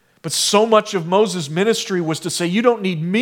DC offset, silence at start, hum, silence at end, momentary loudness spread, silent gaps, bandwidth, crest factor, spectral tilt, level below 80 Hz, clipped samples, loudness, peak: under 0.1%; 0.25 s; none; 0 s; 7 LU; none; 18 kHz; 18 dB; -4 dB/octave; -70 dBFS; under 0.1%; -18 LUFS; 0 dBFS